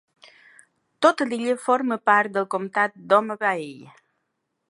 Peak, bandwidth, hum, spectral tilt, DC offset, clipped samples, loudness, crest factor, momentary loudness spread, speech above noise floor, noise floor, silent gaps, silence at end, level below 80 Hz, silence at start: -2 dBFS; 11.5 kHz; none; -4.5 dB/octave; under 0.1%; under 0.1%; -22 LUFS; 22 dB; 6 LU; 55 dB; -77 dBFS; none; 0.9 s; -78 dBFS; 1 s